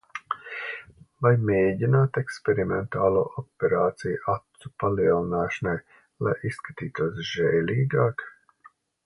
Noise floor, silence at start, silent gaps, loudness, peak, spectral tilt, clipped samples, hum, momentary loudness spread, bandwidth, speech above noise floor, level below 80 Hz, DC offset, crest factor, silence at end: -57 dBFS; 0.15 s; none; -26 LUFS; -6 dBFS; -7.5 dB/octave; under 0.1%; none; 12 LU; 11 kHz; 32 dB; -54 dBFS; under 0.1%; 20 dB; 0.75 s